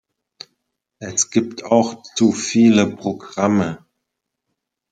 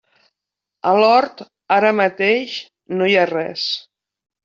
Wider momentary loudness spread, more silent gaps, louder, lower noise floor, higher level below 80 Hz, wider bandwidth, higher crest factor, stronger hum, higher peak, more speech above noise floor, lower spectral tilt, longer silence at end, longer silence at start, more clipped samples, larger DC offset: about the same, 12 LU vs 13 LU; neither; about the same, -18 LUFS vs -17 LUFS; second, -79 dBFS vs -84 dBFS; first, -62 dBFS vs -68 dBFS; first, 9.4 kHz vs 7.6 kHz; about the same, 18 dB vs 16 dB; neither; about the same, -2 dBFS vs -2 dBFS; second, 61 dB vs 67 dB; about the same, -4.5 dB/octave vs -5 dB/octave; first, 1.15 s vs 0.65 s; first, 1 s vs 0.85 s; neither; neither